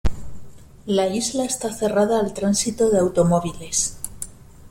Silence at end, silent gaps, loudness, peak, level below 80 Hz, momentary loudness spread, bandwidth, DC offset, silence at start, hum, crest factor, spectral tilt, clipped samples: 0 s; none; -21 LUFS; -6 dBFS; -38 dBFS; 14 LU; 16.5 kHz; under 0.1%; 0.05 s; none; 16 dB; -4.5 dB/octave; under 0.1%